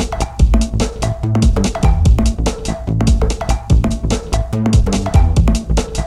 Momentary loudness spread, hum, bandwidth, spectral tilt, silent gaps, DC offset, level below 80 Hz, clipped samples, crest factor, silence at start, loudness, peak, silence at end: 6 LU; none; 12 kHz; -6 dB/octave; none; under 0.1%; -16 dBFS; under 0.1%; 14 dB; 0 s; -16 LUFS; 0 dBFS; 0 s